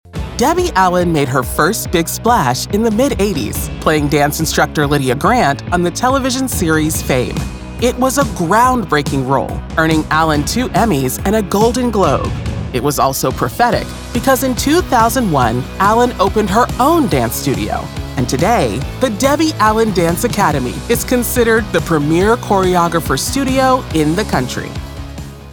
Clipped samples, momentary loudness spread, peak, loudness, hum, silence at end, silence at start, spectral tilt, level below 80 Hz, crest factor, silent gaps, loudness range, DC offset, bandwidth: under 0.1%; 6 LU; 0 dBFS; -14 LUFS; none; 0 s; 0.05 s; -5 dB/octave; -28 dBFS; 14 dB; none; 1 LU; under 0.1%; over 20 kHz